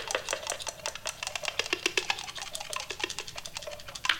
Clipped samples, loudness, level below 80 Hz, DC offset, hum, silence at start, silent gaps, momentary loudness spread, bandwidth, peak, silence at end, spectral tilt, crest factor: under 0.1%; -33 LUFS; -58 dBFS; under 0.1%; none; 0 s; none; 10 LU; 17.5 kHz; -4 dBFS; 0 s; 0 dB/octave; 30 dB